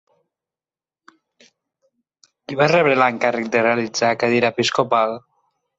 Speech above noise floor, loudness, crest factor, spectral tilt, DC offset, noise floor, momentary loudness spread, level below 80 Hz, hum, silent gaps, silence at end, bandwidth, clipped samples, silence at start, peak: over 72 dB; -18 LUFS; 18 dB; -4.5 dB/octave; under 0.1%; under -90 dBFS; 6 LU; -66 dBFS; none; none; 0.6 s; 8.2 kHz; under 0.1%; 2.5 s; -2 dBFS